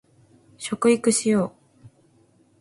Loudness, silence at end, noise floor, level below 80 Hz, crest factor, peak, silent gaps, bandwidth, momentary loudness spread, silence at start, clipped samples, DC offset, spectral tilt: -22 LUFS; 1.1 s; -59 dBFS; -64 dBFS; 18 dB; -8 dBFS; none; 11.5 kHz; 13 LU; 0.6 s; under 0.1%; under 0.1%; -4.5 dB/octave